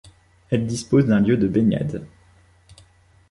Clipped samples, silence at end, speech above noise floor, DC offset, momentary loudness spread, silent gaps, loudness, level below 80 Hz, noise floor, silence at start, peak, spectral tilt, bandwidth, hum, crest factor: under 0.1%; 1.25 s; 35 dB; under 0.1%; 9 LU; none; -20 LUFS; -48 dBFS; -54 dBFS; 0.5 s; -6 dBFS; -7.5 dB/octave; 11.5 kHz; none; 16 dB